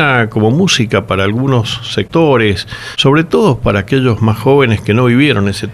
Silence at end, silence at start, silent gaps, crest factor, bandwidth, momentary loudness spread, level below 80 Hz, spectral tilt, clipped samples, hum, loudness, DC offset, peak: 0 s; 0 s; none; 12 dB; 13.5 kHz; 5 LU; -36 dBFS; -6 dB/octave; under 0.1%; none; -11 LUFS; under 0.1%; 0 dBFS